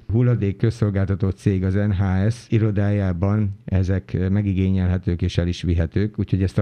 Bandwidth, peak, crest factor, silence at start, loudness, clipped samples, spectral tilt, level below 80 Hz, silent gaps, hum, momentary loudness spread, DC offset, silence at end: 8.8 kHz; -4 dBFS; 16 dB; 0.1 s; -21 LUFS; under 0.1%; -8.5 dB/octave; -38 dBFS; none; none; 3 LU; under 0.1%; 0 s